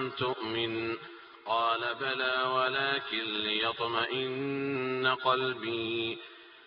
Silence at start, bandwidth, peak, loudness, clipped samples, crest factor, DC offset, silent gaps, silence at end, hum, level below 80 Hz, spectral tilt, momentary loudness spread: 0 s; 5.4 kHz; -12 dBFS; -31 LUFS; under 0.1%; 20 dB; under 0.1%; none; 0 s; none; -72 dBFS; -1.5 dB/octave; 8 LU